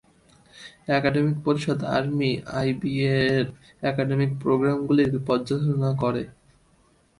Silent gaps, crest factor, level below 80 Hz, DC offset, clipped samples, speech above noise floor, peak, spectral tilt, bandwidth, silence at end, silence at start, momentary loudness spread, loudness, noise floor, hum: none; 18 dB; -54 dBFS; under 0.1%; under 0.1%; 38 dB; -6 dBFS; -7.5 dB/octave; 11.5 kHz; 0.9 s; 0.55 s; 9 LU; -24 LUFS; -61 dBFS; none